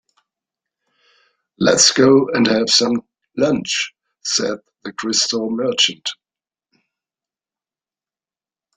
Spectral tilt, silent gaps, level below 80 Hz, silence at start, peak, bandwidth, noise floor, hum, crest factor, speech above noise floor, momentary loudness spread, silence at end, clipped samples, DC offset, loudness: -2.5 dB/octave; none; -60 dBFS; 1.6 s; 0 dBFS; 11 kHz; under -90 dBFS; none; 20 dB; over 74 dB; 16 LU; 2.65 s; under 0.1%; under 0.1%; -16 LUFS